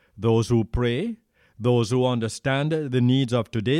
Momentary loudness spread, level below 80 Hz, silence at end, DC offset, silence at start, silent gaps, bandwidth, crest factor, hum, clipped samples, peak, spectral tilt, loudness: 7 LU; -44 dBFS; 0 s; under 0.1%; 0.15 s; none; 11.5 kHz; 14 dB; none; under 0.1%; -10 dBFS; -6.5 dB/octave; -23 LUFS